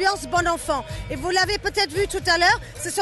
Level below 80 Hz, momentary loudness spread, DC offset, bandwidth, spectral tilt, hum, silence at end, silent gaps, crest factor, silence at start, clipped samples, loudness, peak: -40 dBFS; 10 LU; under 0.1%; 12.5 kHz; -2.5 dB/octave; none; 0 s; none; 14 dB; 0 s; under 0.1%; -22 LUFS; -8 dBFS